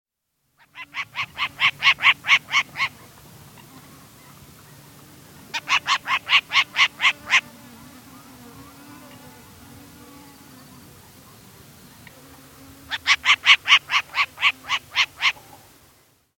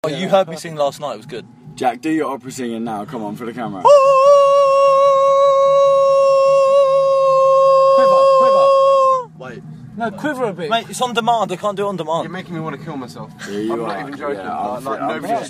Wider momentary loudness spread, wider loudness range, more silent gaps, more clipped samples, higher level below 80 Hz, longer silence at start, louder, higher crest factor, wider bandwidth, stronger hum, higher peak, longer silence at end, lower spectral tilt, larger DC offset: about the same, 15 LU vs 16 LU; about the same, 10 LU vs 11 LU; neither; neither; about the same, -62 dBFS vs -62 dBFS; first, 0.75 s vs 0.05 s; second, -19 LUFS vs -14 LUFS; first, 24 dB vs 14 dB; first, 17 kHz vs 12.5 kHz; neither; about the same, 0 dBFS vs 0 dBFS; first, 1.1 s vs 0 s; second, 0.5 dB/octave vs -5 dB/octave; neither